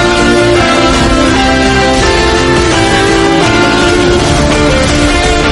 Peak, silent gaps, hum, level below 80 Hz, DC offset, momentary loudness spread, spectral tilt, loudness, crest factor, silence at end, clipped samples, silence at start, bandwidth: 0 dBFS; none; none; -18 dBFS; under 0.1%; 1 LU; -4.5 dB/octave; -8 LUFS; 8 dB; 0 s; 0.2%; 0 s; 11.5 kHz